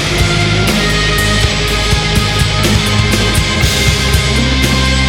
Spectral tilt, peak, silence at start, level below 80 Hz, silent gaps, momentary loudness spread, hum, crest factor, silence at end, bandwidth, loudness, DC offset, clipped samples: -4 dB/octave; 0 dBFS; 0 s; -18 dBFS; none; 1 LU; none; 12 dB; 0 s; 18 kHz; -11 LUFS; under 0.1%; under 0.1%